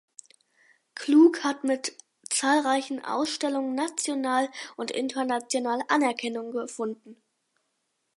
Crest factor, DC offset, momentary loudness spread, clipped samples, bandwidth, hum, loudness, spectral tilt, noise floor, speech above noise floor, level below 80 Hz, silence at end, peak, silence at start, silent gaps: 20 dB; under 0.1%; 13 LU; under 0.1%; 11.5 kHz; none; -26 LUFS; -2 dB/octave; -77 dBFS; 51 dB; -82 dBFS; 1.05 s; -8 dBFS; 0.95 s; none